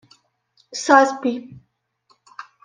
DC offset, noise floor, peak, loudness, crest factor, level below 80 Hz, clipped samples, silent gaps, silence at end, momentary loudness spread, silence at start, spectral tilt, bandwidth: under 0.1%; -63 dBFS; -2 dBFS; -17 LUFS; 20 dB; -68 dBFS; under 0.1%; none; 0.2 s; 25 LU; 0.7 s; -3 dB/octave; 10 kHz